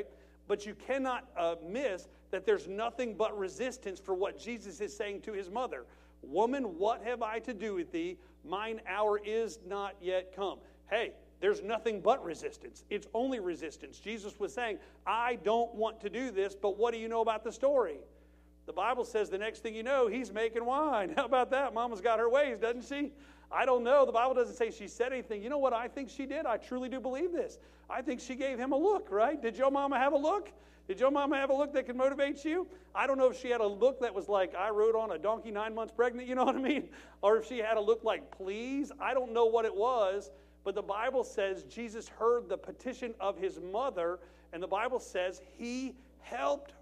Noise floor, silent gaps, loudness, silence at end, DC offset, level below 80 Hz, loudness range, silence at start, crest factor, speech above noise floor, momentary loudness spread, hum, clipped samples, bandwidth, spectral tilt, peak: -61 dBFS; none; -34 LUFS; 0.1 s; under 0.1%; -62 dBFS; 5 LU; 0 s; 18 dB; 27 dB; 12 LU; none; under 0.1%; 11.5 kHz; -4.5 dB/octave; -14 dBFS